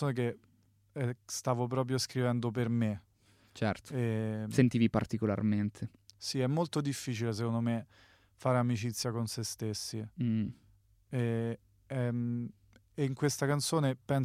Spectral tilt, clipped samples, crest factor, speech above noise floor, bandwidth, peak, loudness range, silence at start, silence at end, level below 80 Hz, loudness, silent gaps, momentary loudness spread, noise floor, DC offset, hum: -6 dB/octave; under 0.1%; 20 dB; 27 dB; 15.5 kHz; -12 dBFS; 4 LU; 0 s; 0 s; -66 dBFS; -34 LUFS; none; 9 LU; -60 dBFS; under 0.1%; none